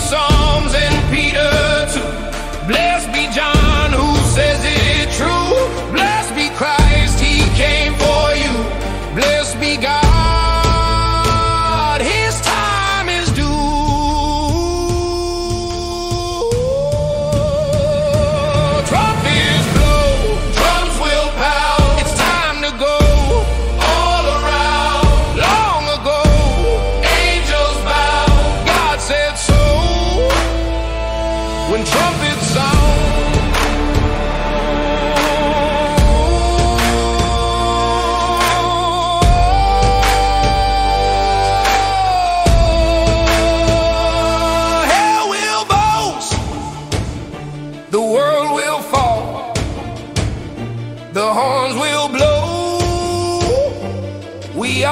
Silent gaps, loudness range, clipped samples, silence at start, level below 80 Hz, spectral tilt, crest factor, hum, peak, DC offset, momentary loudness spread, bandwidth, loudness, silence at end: none; 4 LU; under 0.1%; 0 s; -20 dBFS; -4.5 dB/octave; 14 dB; none; 0 dBFS; under 0.1%; 7 LU; 16 kHz; -15 LUFS; 0 s